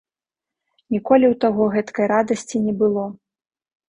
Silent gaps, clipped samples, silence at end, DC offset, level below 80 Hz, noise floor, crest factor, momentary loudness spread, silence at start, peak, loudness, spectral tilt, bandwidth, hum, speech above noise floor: none; under 0.1%; 0.75 s; under 0.1%; -60 dBFS; -88 dBFS; 20 dB; 10 LU; 0.9 s; -2 dBFS; -19 LUFS; -6.5 dB/octave; 10.5 kHz; none; 70 dB